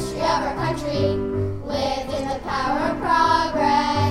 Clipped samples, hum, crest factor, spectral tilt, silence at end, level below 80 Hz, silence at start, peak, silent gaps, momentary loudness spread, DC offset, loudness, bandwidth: under 0.1%; none; 14 dB; -5.5 dB/octave; 0 s; -40 dBFS; 0 s; -6 dBFS; none; 7 LU; under 0.1%; -22 LUFS; 15 kHz